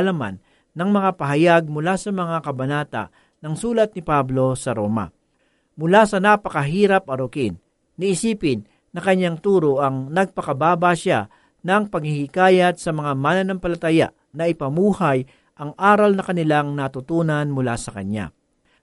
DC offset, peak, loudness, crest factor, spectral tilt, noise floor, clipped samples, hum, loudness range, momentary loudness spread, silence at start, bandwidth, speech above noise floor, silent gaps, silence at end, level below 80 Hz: under 0.1%; -2 dBFS; -20 LUFS; 18 dB; -6 dB/octave; -65 dBFS; under 0.1%; none; 2 LU; 13 LU; 0 s; 11.5 kHz; 46 dB; none; 0.55 s; -50 dBFS